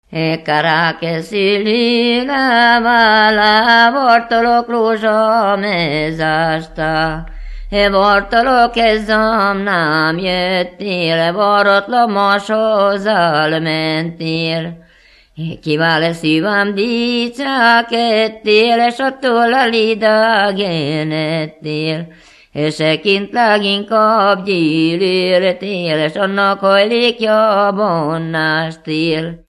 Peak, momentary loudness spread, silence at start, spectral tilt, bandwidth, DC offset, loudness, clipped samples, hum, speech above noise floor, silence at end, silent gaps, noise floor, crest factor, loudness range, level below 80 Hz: 0 dBFS; 9 LU; 0.1 s; -5.5 dB/octave; 12 kHz; under 0.1%; -13 LUFS; under 0.1%; none; 34 dB; 0.1 s; none; -48 dBFS; 14 dB; 6 LU; -40 dBFS